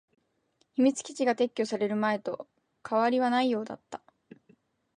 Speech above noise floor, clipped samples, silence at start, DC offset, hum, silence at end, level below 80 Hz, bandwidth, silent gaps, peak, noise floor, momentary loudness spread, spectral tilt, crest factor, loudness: 45 dB; under 0.1%; 0.8 s; under 0.1%; none; 1 s; -80 dBFS; 10.5 kHz; none; -12 dBFS; -73 dBFS; 16 LU; -4.5 dB/octave; 18 dB; -28 LUFS